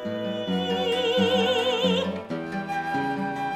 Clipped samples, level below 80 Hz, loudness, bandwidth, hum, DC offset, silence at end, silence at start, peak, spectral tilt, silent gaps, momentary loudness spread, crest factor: under 0.1%; -64 dBFS; -25 LUFS; 14 kHz; none; under 0.1%; 0 s; 0 s; -10 dBFS; -5 dB/octave; none; 8 LU; 16 dB